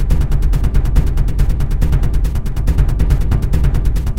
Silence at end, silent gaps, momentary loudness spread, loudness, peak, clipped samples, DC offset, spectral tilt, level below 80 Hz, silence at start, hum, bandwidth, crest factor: 0 s; none; 3 LU; -17 LUFS; 0 dBFS; under 0.1%; 5%; -7.5 dB/octave; -14 dBFS; 0 s; none; 15.5 kHz; 12 dB